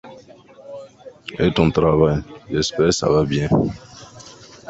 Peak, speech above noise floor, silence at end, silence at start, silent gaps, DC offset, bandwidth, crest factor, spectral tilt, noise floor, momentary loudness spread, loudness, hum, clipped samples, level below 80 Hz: -2 dBFS; 27 dB; 0.4 s; 0.05 s; none; under 0.1%; 8 kHz; 18 dB; -6 dB/octave; -45 dBFS; 23 LU; -19 LUFS; none; under 0.1%; -40 dBFS